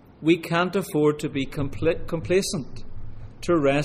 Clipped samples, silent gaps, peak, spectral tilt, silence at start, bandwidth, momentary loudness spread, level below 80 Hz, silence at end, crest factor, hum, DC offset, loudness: under 0.1%; none; -6 dBFS; -5.5 dB/octave; 0.2 s; 15.5 kHz; 20 LU; -40 dBFS; 0 s; 18 dB; none; under 0.1%; -24 LUFS